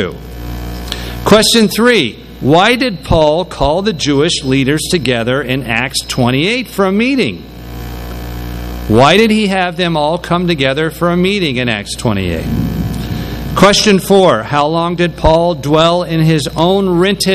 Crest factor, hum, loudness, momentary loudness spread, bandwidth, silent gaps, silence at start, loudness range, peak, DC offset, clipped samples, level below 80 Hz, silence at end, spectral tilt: 12 dB; none; -12 LUFS; 14 LU; 16 kHz; none; 0 s; 4 LU; 0 dBFS; under 0.1%; 0.3%; -28 dBFS; 0 s; -5 dB/octave